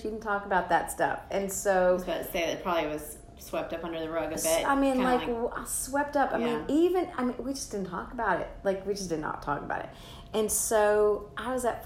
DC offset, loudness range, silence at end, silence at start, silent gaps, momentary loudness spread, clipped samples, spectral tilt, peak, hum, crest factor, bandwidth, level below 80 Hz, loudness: under 0.1%; 3 LU; 0 s; 0 s; none; 10 LU; under 0.1%; -3.5 dB/octave; -12 dBFS; none; 18 dB; 16 kHz; -50 dBFS; -29 LUFS